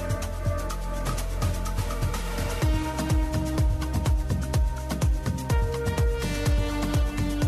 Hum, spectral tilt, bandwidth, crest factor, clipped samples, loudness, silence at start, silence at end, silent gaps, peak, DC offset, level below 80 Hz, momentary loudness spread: none; -6 dB/octave; 14 kHz; 10 dB; under 0.1%; -28 LUFS; 0 s; 0 s; none; -14 dBFS; under 0.1%; -28 dBFS; 4 LU